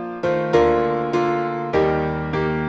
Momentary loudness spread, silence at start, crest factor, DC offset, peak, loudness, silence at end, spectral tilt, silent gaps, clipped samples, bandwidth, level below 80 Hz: 6 LU; 0 s; 16 dB; under 0.1%; -4 dBFS; -20 LUFS; 0 s; -7.5 dB/octave; none; under 0.1%; 7.4 kHz; -40 dBFS